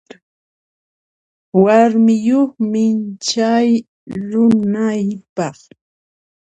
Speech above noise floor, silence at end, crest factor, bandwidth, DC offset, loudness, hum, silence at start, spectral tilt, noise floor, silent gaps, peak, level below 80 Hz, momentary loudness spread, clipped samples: over 76 dB; 1.05 s; 16 dB; 8.4 kHz; under 0.1%; -15 LUFS; none; 1.55 s; -6 dB/octave; under -90 dBFS; 3.88-4.07 s, 5.29-5.36 s; 0 dBFS; -58 dBFS; 13 LU; under 0.1%